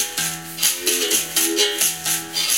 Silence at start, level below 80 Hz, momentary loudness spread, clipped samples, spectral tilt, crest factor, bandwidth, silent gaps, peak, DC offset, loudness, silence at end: 0 s; -62 dBFS; 5 LU; under 0.1%; 0 dB/octave; 22 dB; 17 kHz; none; 0 dBFS; 0.2%; -18 LUFS; 0 s